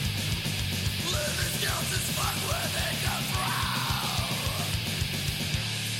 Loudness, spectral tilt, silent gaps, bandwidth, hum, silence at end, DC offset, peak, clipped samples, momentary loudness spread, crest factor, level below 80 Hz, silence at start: -28 LUFS; -3 dB/octave; none; 16.5 kHz; none; 0 s; under 0.1%; -14 dBFS; under 0.1%; 2 LU; 14 dB; -42 dBFS; 0 s